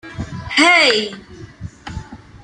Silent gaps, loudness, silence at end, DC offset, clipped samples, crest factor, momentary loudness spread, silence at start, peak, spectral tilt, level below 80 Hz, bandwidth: none; -12 LUFS; 0.05 s; under 0.1%; under 0.1%; 18 dB; 25 LU; 0.05 s; -2 dBFS; -3 dB/octave; -42 dBFS; 11.5 kHz